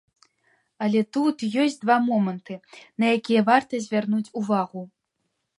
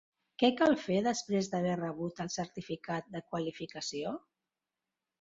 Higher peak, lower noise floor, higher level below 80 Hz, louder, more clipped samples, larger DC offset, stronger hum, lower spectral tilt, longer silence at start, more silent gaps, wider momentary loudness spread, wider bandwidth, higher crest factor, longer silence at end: first, -4 dBFS vs -14 dBFS; second, -77 dBFS vs under -90 dBFS; about the same, -74 dBFS vs -72 dBFS; first, -23 LUFS vs -34 LUFS; neither; neither; neither; about the same, -6 dB/octave vs -5 dB/octave; first, 0.8 s vs 0.4 s; neither; first, 18 LU vs 12 LU; first, 11 kHz vs 7.8 kHz; about the same, 20 dB vs 22 dB; second, 0.75 s vs 1.05 s